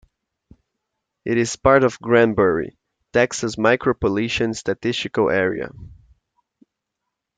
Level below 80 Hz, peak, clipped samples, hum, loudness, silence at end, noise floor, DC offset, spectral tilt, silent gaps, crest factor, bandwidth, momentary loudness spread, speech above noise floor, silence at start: -48 dBFS; 0 dBFS; under 0.1%; none; -19 LUFS; 1.5 s; -81 dBFS; under 0.1%; -5 dB/octave; none; 20 dB; 9.4 kHz; 9 LU; 62 dB; 1.25 s